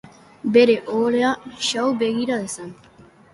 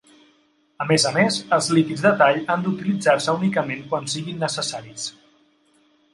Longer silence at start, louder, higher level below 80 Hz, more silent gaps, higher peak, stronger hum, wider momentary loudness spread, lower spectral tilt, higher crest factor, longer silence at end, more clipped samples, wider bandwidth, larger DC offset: second, 0.45 s vs 0.8 s; about the same, -20 LUFS vs -21 LUFS; about the same, -62 dBFS vs -66 dBFS; neither; about the same, -4 dBFS vs -2 dBFS; neither; first, 15 LU vs 12 LU; about the same, -4 dB/octave vs -4.5 dB/octave; about the same, 18 dB vs 20 dB; second, 0.6 s vs 1.05 s; neither; about the same, 11.5 kHz vs 11.5 kHz; neither